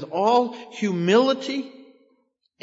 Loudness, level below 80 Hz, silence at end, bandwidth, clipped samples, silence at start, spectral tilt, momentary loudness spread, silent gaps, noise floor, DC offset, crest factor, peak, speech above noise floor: -22 LUFS; -84 dBFS; 0.8 s; 8 kHz; under 0.1%; 0 s; -5.5 dB/octave; 12 LU; none; -68 dBFS; under 0.1%; 18 dB; -6 dBFS; 46 dB